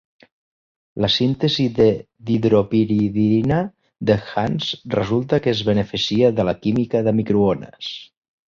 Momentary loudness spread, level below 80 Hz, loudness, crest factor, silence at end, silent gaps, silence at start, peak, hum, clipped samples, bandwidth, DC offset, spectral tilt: 9 LU; -48 dBFS; -19 LUFS; 16 dB; 0.45 s; none; 0.95 s; -2 dBFS; none; under 0.1%; 7.2 kHz; under 0.1%; -7 dB/octave